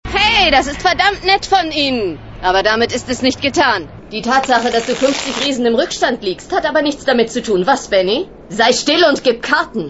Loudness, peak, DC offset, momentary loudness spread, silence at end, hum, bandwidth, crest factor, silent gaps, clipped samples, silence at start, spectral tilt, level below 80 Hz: -14 LUFS; 0 dBFS; 0.3%; 7 LU; 0 s; none; 8.2 kHz; 14 dB; none; under 0.1%; 0.05 s; -3 dB/octave; -38 dBFS